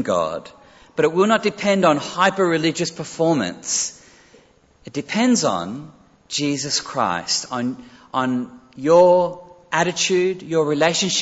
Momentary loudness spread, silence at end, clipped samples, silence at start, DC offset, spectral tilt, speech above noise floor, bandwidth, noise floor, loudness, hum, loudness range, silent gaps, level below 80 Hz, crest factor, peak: 11 LU; 0 s; under 0.1%; 0 s; under 0.1%; -3.5 dB/octave; 34 dB; 8.2 kHz; -53 dBFS; -19 LUFS; none; 4 LU; none; -60 dBFS; 18 dB; -2 dBFS